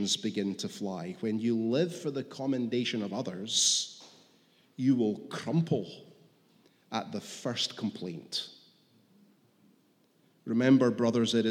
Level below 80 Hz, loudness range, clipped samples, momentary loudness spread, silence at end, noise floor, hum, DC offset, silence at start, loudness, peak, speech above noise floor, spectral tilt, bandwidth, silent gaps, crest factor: -82 dBFS; 7 LU; under 0.1%; 14 LU; 0 s; -67 dBFS; none; under 0.1%; 0 s; -30 LUFS; -12 dBFS; 37 dB; -4 dB/octave; 15.5 kHz; none; 20 dB